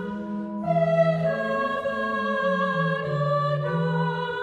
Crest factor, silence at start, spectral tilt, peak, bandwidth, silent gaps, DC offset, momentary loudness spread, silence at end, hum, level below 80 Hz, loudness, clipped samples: 16 dB; 0 s; -8 dB/octave; -10 dBFS; 8 kHz; none; under 0.1%; 5 LU; 0 s; none; -60 dBFS; -25 LUFS; under 0.1%